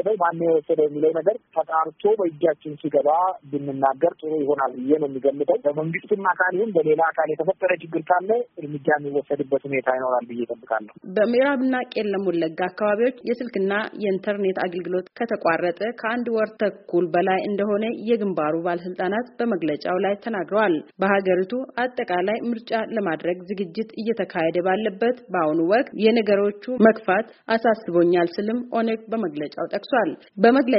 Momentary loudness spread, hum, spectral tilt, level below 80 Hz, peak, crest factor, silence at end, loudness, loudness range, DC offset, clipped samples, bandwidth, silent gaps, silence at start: 7 LU; none; -4.5 dB/octave; -70 dBFS; -2 dBFS; 20 dB; 0 s; -23 LUFS; 4 LU; under 0.1%; under 0.1%; 5.8 kHz; none; 0 s